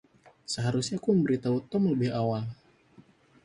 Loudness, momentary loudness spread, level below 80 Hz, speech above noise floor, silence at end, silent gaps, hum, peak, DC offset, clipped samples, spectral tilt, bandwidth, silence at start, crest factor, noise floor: -28 LUFS; 10 LU; -64 dBFS; 31 dB; 0.9 s; none; none; -12 dBFS; under 0.1%; under 0.1%; -6.5 dB/octave; 11.5 kHz; 0.5 s; 18 dB; -58 dBFS